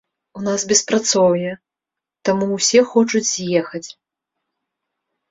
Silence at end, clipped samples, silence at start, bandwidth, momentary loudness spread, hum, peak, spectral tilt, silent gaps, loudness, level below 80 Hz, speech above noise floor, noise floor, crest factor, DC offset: 1.4 s; under 0.1%; 0.35 s; 8 kHz; 15 LU; none; -2 dBFS; -3 dB/octave; none; -17 LUFS; -62 dBFS; 68 dB; -86 dBFS; 18 dB; under 0.1%